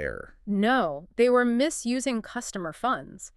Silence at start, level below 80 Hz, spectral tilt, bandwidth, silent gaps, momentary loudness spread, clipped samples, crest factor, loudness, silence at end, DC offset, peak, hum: 0 s; -54 dBFS; -4.5 dB/octave; 13 kHz; none; 12 LU; under 0.1%; 16 dB; -26 LUFS; 0.1 s; under 0.1%; -10 dBFS; none